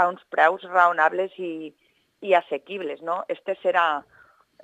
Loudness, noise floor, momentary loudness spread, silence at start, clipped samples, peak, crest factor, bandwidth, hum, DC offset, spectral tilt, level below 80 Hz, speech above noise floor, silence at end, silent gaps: -23 LUFS; -55 dBFS; 13 LU; 0 s; under 0.1%; -4 dBFS; 20 dB; 9 kHz; none; under 0.1%; -5 dB/octave; -78 dBFS; 31 dB; 0.65 s; none